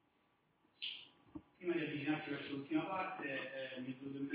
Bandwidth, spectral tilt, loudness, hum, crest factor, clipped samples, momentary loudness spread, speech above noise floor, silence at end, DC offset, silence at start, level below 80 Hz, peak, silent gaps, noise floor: 4 kHz; -3.5 dB/octave; -43 LUFS; none; 18 dB; under 0.1%; 10 LU; 36 dB; 0 s; under 0.1%; 0.8 s; -80 dBFS; -26 dBFS; none; -77 dBFS